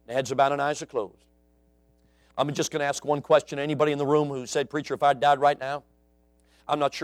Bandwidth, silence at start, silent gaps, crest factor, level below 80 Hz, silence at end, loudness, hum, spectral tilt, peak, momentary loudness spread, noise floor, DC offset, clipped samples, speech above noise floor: 14.5 kHz; 0.1 s; none; 20 dB; -66 dBFS; 0 s; -25 LUFS; none; -4.5 dB/octave; -8 dBFS; 11 LU; -63 dBFS; under 0.1%; under 0.1%; 38 dB